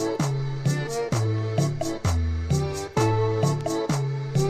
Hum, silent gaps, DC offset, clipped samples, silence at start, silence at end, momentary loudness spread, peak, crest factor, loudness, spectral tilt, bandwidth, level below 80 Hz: none; none; under 0.1%; under 0.1%; 0 s; 0 s; 4 LU; -10 dBFS; 14 dB; -25 LUFS; -6 dB/octave; 15 kHz; -36 dBFS